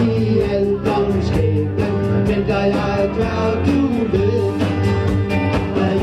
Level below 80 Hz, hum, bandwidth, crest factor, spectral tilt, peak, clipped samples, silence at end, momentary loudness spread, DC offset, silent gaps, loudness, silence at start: -32 dBFS; none; 11 kHz; 14 dB; -8 dB/octave; -4 dBFS; under 0.1%; 0 s; 2 LU; under 0.1%; none; -18 LUFS; 0 s